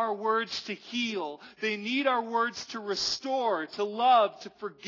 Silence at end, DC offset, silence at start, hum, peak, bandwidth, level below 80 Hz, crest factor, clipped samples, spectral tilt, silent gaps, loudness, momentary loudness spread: 0 s; under 0.1%; 0 s; none; -12 dBFS; 6 kHz; -74 dBFS; 18 dB; under 0.1%; -2.5 dB/octave; none; -29 LUFS; 12 LU